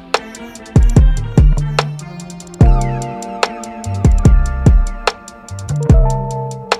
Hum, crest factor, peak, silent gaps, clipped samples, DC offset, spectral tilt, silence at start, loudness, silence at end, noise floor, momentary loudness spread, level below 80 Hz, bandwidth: none; 14 dB; 0 dBFS; none; 0.1%; under 0.1%; -6.5 dB/octave; 0 s; -15 LUFS; 0 s; -32 dBFS; 17 LU; -16 dBFS; 10.5 kHz